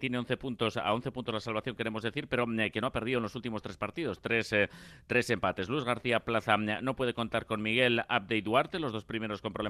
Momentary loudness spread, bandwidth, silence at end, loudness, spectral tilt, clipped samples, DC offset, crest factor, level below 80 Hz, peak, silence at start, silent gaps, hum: 8 LU; 14 kHz; 0 s; -32 LUFS; -5.5 dB/octave; under 0.1%; under 0.1%; 22 dB; -60 dBFS; -10 dBFS; 0 s; none; none